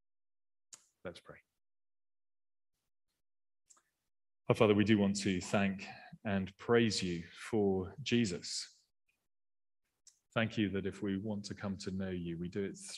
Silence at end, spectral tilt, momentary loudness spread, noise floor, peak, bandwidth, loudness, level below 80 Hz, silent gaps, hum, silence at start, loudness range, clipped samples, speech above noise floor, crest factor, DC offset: 0 s; -5.5 dB/octave; 17 LU; under -90 dBFS; -14 dBFS; 12 kHz; -35 LUFS; -70 dBFS; none; none; 1.05 s; 7 LU; under 0.1%; over 55 dB; 22 dB; under 0.1%